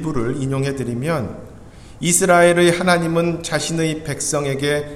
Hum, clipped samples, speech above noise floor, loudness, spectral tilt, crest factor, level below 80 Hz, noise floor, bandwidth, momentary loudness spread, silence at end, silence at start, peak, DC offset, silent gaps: none; under 0.1%; 21 dB; -18 LUFS; -4.5 dB/octave; 18 dB; -44 dBFS; -39 dBFS; 15.5 kHz; 11 LU; 0 s; 0 s; 0 dBFS; under 0.1%; none